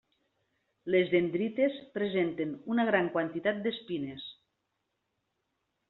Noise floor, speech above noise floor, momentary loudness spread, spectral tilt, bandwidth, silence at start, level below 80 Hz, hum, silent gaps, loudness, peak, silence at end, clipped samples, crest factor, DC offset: -82 dBFS; 52 dB; 11 LU; -4.5 dB/octave; 4.2 kHz; 0.85 s; -74 dBFS; none; none; -31 LUFS; -12 dBFS; 1.55 s; under 0.1%; 22 dB; under 0.1%